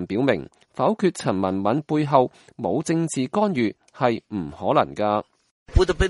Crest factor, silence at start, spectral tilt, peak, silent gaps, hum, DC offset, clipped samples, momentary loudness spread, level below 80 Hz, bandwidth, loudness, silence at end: 20 dB; 0 s; -6 dB/octave; -2 dBFS; 5.51-5.66 s; none; under 0.1%; under 0.1%; 7 LU; -36 dBFS; 11.5 kHz; -23 LUFS; 0 s